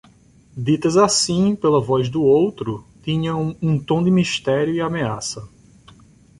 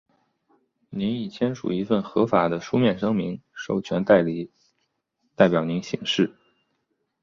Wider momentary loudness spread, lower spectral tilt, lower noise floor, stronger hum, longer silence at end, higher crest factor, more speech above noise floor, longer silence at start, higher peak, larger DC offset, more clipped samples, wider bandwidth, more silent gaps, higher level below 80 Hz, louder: first, 13 LU vs 10 LU; about the same, -5.5 dB/octave vs -6.5 dB/octave; second, -51 dBFS vs -75 dBFS; neither; about the same, 0.9 s vs 0.95 s; about the same, 18 dB vs 22 dB; second, 33 dB vs 52 dB; second, 0.55 s vs 0.9 s; about the same, -2 dBFS vs -2 dBFS; neither; neither; first, 11.5 kHz vs 7.4 kHz; neither; first, -50 dBFS vs -60 dBFS; first, -19 LUFS vs -24 LUFS